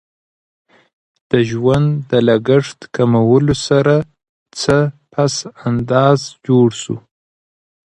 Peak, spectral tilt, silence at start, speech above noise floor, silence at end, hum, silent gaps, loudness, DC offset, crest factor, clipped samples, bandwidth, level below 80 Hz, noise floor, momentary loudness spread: 0 dBFS; -6.5 dB/octave; 1.35 s; over 76 dB; 0.95 s; none; 4.29-4.46 s; -15 LUFS; under 0.1%; 16 dB; under 0.1%; 11 kHz; -46 dBFS; under -90 dBFS; 10 LU